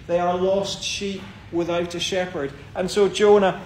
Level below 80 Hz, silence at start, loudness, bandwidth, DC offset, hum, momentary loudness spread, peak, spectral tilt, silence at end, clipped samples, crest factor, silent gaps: -50 dBFS; 0 s; -22 LUFS; 14 kHz; under 0.1%; none; 14 LU; -4 dBFS; -4.5 dB/octave; 0 s; under 0.1%; 18 dB; none